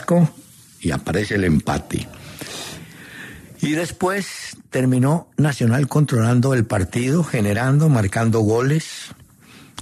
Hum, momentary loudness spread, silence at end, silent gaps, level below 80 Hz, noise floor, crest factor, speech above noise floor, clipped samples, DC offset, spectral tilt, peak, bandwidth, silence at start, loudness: none; 18 LU; 0 s; none; -48 dBFS; -46 dBFS; 14 dB; 28 dB; under 0.1%; under 0.1%; -6.5 dB/octave; -6 dBFS; 13.5 kHz; 0 s; -19 LUFS